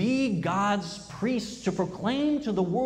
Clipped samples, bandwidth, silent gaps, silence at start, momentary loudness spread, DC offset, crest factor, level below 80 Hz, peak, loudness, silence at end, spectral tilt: under 0.1%; 11 kHz; none; 0 s; 5 LU; under 0.1%; 12 dB; -56 dBFS; -14 dBFS; -28 LUFS; 0 s; -6 dB/octave